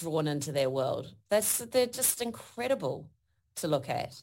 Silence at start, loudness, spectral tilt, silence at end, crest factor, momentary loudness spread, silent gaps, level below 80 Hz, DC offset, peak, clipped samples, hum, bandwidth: 0 s; -30 LUFS; -3.5 dB/octave; 0 s; 18 dB; 10 LU; none; -68 dBFS; under 0.1%; -12 dBFS; under 0.1%; none; 17 kHz